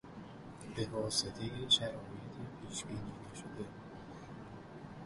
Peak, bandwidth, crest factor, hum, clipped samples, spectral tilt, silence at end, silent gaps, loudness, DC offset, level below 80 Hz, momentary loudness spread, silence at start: -18 dBFS; 11.5 kHz; 24 dB; none; under 0.1%; -3.5 dB/octave; 0 s; none; -38 LUFS; under 0.1%; -62 dBFS; 20 LU; 0.05 s